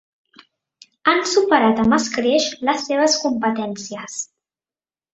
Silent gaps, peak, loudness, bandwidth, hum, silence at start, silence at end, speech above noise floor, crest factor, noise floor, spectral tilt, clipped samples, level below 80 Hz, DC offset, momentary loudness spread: none; -2 dBFS; -18 LUFS; 8.2 kHz; none; 1.05 s; 0.9 s; over 72 dB; 18 dB; under -90 dBFS; -3 dB/octave; under 0.1%; -56 dBFS; under 0.1%; 14 LU